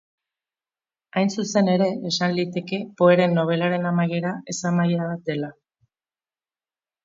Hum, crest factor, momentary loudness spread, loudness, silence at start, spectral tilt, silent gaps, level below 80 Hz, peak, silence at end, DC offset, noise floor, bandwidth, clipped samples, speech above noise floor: none; 20 dB; 10 LU; -22 LUFS; 1.15 s; -6 dB/octave; none; -68 dBFS; -4 dBFS; 1.55 s; under 0.1%; under -90 dBFS; 7.6 kHz; under 0.1%; over 69 dB